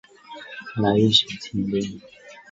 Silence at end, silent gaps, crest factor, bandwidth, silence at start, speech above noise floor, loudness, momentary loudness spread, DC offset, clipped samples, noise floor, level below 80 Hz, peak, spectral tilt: 0.1 s; none; 22 dB; 8 kHz; 0.3 s; 20 dB; -21 LUFS; 24 LU; under 0.1%; under 0.1%; -42 dBFS; -54 dBFS; -2 dBFS; -5 dB/octave